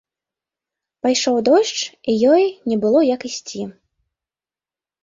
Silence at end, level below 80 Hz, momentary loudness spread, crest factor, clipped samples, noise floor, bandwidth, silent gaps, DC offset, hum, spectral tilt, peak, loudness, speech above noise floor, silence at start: 1.3 s; -64 dBFS; 13 LU; 16 dB; under 0.1%; under -90 dBFS; 7.8 kHz; none; under 0.1%; none; -3.5 dB/octave; -4 dBFS; -17 LUFS; over 73 dB; 1.05 s